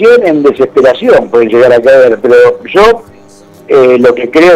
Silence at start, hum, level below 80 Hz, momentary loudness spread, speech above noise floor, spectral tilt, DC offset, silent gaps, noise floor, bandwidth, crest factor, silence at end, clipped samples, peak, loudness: 0 s; none; -40 dBFS; 4 LU; 30 dB; -5.5 dB/octave; under 0.1%; none; -35 dBFS; 11 kHz; 6 dB; 0 s; 3%; 0 dBFS; -6 LUFS